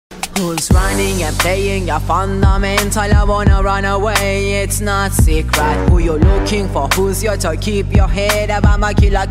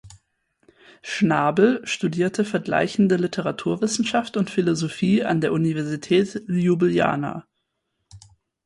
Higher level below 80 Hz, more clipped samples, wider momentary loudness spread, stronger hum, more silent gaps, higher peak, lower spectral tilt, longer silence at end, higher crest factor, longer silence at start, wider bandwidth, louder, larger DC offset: first, -16 dBFS vs -60 dBFS; neither; about the same, 4 LU vs 6 LU; neither; neither; first, 0 dBFS vs -4 dBFS; about the same, -5 dB/octave vs -6 dB/octave; second, 0 s vs 0.45 s; second, 12 dB vs 18 dB; about the same, 0.1 s vs 0.05 s; first, 16.5 kHz vs 11.5 kHz; first, -15 LUFS vs -22 LUFS; neither